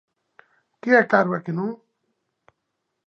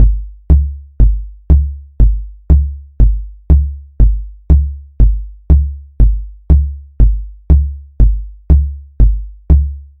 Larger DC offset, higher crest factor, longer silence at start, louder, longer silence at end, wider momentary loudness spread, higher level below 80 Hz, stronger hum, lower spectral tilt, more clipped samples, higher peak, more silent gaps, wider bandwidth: second, under 0.1% vs 0.9%; first, 22 dB vs 12 dB; first, 0.85 s vs 0 s; second, -21 LUFS vs -15 LUFS; first, 1.3 s vs 0.15 s; first, 16 LU vs 10 LU; second, -78 dBFS vs -12 dBFS; neither; second, -8 dB/octave vs -12.5 dB/octave; second, under 0.1% vs 1%; about the same, -2 dBFS vs 0 dBFS; neither; first, 6.8 kHz vs 1.6 kHz